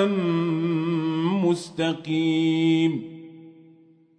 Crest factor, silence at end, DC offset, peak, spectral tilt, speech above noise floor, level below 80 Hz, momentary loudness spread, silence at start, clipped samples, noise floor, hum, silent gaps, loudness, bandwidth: 14 dB; 0.65 s; under 0.1%; -10 dBFS; -7 dB/octave; 32 dB; -72 dBFS; 6 LU; 0 s; under 0.1%; -55 dBFS; none; none; -23 LUFS; 10 kHz